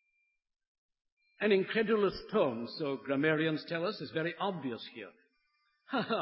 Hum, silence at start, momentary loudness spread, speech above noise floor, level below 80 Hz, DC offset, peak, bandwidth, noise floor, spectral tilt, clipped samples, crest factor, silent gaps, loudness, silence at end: none; 1.4 s; 11 LU; 46 dB; -70 dBFS; under 0.1%; -16 dBFS; 5.6 kHz; -79 dBFS; -4 dB/octave; under 0.1%; 18 dB; none; -33 LUFS; 0 s